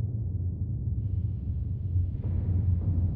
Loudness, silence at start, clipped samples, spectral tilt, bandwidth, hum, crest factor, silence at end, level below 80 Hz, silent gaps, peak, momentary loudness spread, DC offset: -31 LUFS; 0 s; under 0.1%; -13.5 dB/octave; 1.3 kHz; none; 12 dB; 0 s; -36 dBFS; none; -18 dBFS; 5 LU; under 0.1%